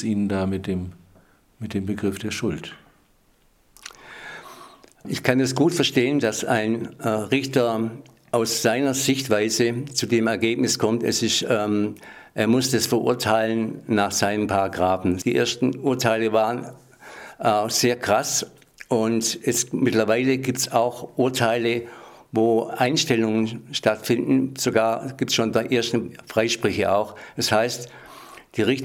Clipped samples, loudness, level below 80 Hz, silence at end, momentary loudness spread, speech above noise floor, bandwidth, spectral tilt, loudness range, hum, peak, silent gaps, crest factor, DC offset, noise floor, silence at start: under 0.1%; -22 LUFS; -62 dBFS; 0 s; 14 LU; 38 dB; 17.5 kHz; -4 dB/octave; 6 LU; none; 0 dBFS; none; 22 dB; under 0.1%; -60 dBFS; 0 s